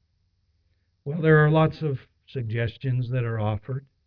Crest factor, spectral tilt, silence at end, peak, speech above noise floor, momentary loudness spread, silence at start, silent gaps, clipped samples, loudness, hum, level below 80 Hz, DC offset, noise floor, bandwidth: 18 dB; -10.5 dB/octave; 0.25 s; -6 dBFS; 46 dB; 17 LU; 1.05 s; none; under 0.1%; -24 LUFS; none; -52 dBFS; under 0.1%; -69 dBFS; 5.2 kHz